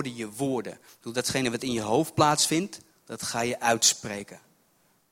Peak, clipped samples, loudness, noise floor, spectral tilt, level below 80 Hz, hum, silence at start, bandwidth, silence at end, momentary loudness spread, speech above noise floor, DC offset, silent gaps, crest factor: -6 dBFS; under 0.1%; -26 LUFS; -66 dBFS; -3 dB/octave; -62 dBFS; none; 0 s; 16.5 kHz; 0.75 s; 20 LU; 39 dB; under 0.1%; none; 22 dB